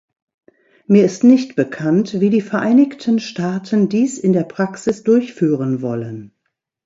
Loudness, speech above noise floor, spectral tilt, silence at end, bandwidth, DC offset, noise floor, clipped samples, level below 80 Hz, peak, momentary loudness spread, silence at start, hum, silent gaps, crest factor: -16 LUFS; 58 dB; -7 dB/octave; 0.6 s; 7.8 kHz; under 0.1%; -74 dBFS; under 0.1%; -62 dBFS; 0 dBFS; 9 LU; 0.9 s; none; none; 16 dB